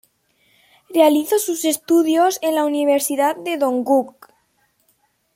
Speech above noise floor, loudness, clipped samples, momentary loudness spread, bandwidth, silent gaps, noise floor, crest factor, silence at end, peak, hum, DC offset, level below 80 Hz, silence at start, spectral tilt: 47 dB; -18 LUFS; under 0.1%; 6 LU; 16.5 kHz; none; -64 dBFS; 18 dB; 1.25 s; -2 dBFS; none; under 0.1%; -72 dBFS; 0.9 s; -2.5 dB/octave